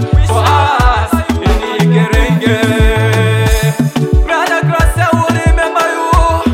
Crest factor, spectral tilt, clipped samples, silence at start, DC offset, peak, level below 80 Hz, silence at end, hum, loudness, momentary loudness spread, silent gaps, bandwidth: 10 dB; -6 dB/octave; 0.3%; 0 s; under 0.1%; 0 dBFS; -16 dBFS; 0 s; none; -11 LUFS; 3 LU; none; 16.5 kHz